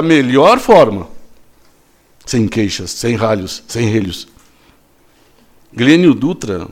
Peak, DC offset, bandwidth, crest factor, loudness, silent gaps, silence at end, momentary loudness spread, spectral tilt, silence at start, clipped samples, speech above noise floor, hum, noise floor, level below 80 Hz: 0 dBFS; under 0.1%; 16 kHz; 14 dB; -12 LUFS; none; 0 s; 16 LU; -5.5 dB/octave; 0 s; 0.2%; 38 dB; none; -50 dBFS; -44 dBFS